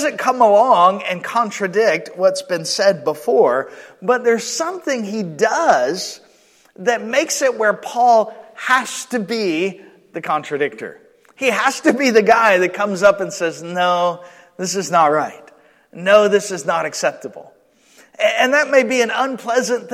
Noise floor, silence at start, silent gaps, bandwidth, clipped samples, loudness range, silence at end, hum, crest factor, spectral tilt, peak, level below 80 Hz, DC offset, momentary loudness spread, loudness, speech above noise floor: -53 dBFS; 0 s; none; 15.5 kHz; under 0.1%; 3 LU; 0 s; none; 16 dB; -3.5 dB/octave; 0 dBFS; -66 dBFS; under 0.1%; 11 LU; -17 LUFS; 36 dB